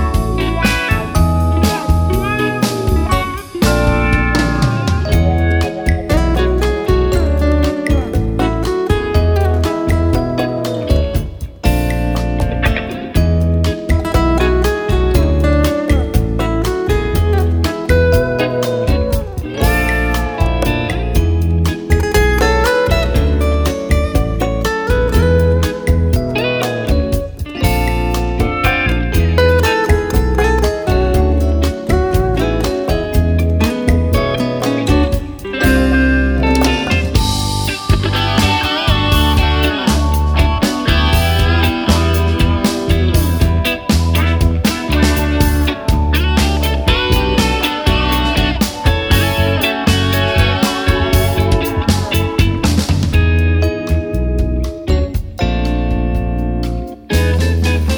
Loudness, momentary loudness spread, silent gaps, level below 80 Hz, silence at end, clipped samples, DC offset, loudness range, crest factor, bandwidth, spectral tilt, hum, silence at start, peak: -15 LUFS; 4 LU; none; -18 dBFS; 0 s; under 0.1%; under 0.1%; 2 LU; 14 dB; over 20 kHz; -6 dB/octave; none; 0 s; 0 dBFS